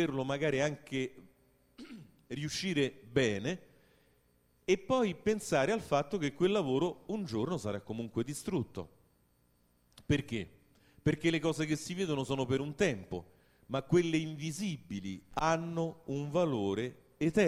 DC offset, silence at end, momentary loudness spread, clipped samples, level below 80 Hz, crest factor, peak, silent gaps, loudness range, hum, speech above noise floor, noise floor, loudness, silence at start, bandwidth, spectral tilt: under 0.1%; 0 s; 12 LU; under 0.1%; -62 dBFS; 20 dB; -14 dBFS; none; 5 LU; 60 Hz at -60 dBFS; 38 dB; -71 dBFS; -34 LUFS; 0 s; 15.5 kHz; -5.5 dB/octave